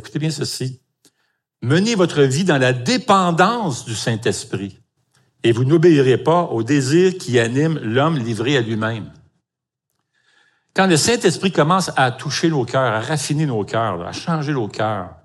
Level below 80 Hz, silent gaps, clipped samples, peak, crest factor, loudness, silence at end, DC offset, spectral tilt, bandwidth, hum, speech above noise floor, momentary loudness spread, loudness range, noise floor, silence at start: -62 dBFS; none; under 0.1%; -2 dBFS; 18 dB; -18 LUFS; 0.1 s; under 0.1%; -5 dB/octave; 13.5 kHz; none; 65 dB; 9 LU; 4 LU; -82 dBFS; 0.05 s